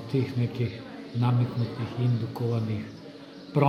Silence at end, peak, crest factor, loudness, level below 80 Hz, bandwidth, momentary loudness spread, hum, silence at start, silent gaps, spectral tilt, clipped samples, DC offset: 0 s; -6 dBFS; 20 dB; -29 LUFS; -62 dBFS; 6.4 kHz; 15 LU; none; 0 s; none; -9 dB/octave; under 0.1%; under 0.1%